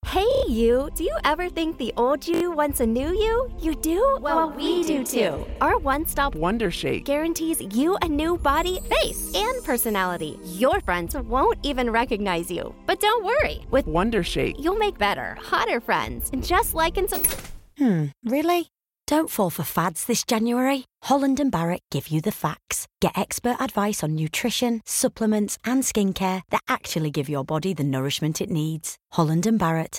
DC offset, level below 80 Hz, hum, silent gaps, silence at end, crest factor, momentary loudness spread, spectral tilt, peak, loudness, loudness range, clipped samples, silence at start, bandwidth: under 0.1%; -38 dBFS; none; none; 0 s; 18 dB; 5 LU; -4.5 dB/octave; -6 dBFS; -24 LUFS; 2 LU; under 0.1%; 0.05 s; 17 kHz